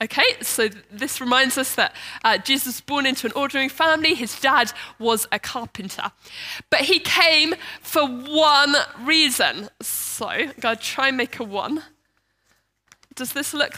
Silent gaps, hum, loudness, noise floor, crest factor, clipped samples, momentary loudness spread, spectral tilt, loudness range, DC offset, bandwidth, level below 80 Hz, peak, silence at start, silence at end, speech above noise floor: none; none; -20 LUFS; -69 dBFS; 20 dB; under 0.1%; 14 LU; -1 dB/octave; 8 LU; under 0.1%; 16 kHz; -64 dBFS; -2 dBFS; 0 s; 0 s; 47 dB